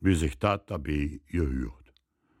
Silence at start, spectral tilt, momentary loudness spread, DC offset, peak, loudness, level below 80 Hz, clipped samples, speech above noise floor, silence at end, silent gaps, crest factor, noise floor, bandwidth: 0 s; -6.5 dB/octave; 7 LU; under 0.1%; -8 dBFS; -30 LUFS; -38 dBFS; under 0.1%; 41 dB; 0.65 s; none; 20 dB; -69 dBFS; 16 kHz